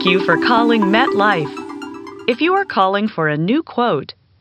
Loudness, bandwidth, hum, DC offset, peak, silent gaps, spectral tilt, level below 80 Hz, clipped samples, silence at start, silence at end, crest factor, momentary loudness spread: -16 LUFS; 9.8 kHz; none; under 0.1%; 0 dBFS; none; -6.5 dB/octave; -60 dBFS; under 0.1%; 0 s; 0.3 s; 16 dB; 16 LU